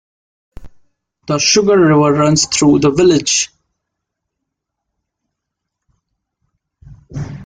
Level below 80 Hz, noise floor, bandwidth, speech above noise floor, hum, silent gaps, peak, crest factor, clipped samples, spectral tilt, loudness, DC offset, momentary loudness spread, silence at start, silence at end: -46 dBFS; -78 dBFS; 9.6 kHz; 66 dB; none; none; 0 dBFS; 16 dB; under 0.1%; -4 dB/octave; -12 LUFS; under 0.1%; 14 LU; 0.6 s; 0 s